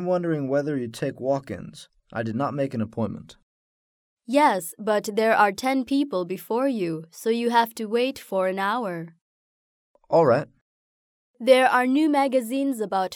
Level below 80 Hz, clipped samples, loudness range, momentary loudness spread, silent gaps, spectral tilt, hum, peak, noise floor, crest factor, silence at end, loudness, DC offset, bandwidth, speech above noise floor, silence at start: -68 dBFS; under 0.1%; 6 LU; 11 LU; 3.43-4.17 s, 9.21-9.94 s, 10.61-11.34 s; -5.5 dB/octave; none; -4 dBFS; under -90 dBFS; 20 dB; 0 s; -23 LUFS; under 0.1%; 20 kHz; over 67 dB; 0 s